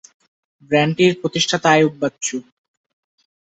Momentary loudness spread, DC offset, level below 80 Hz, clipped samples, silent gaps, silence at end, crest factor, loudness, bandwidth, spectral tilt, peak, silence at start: 11 LU; under 0.1%; -62 dBFS; under 0.1%; none; 1.1 s; 18 dB; -17 LUFS; 8.2 kHz; -4 dB/octave; -2 dBFS; 0.7 s